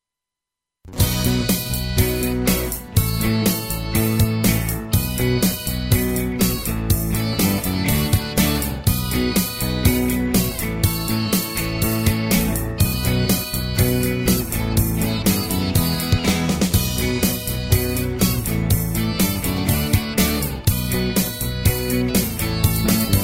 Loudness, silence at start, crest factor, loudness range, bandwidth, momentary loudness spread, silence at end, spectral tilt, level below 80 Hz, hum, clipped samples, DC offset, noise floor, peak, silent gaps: -20 LUFS; 0.85 s; 18 dB; 1 LU; 16.5 kHz; 3 LU; 0 s; -4.5 dB/octave; -30 dBFS; none; under 0.1%; under 0.1%; -86 dBFS; -2 dBFS; none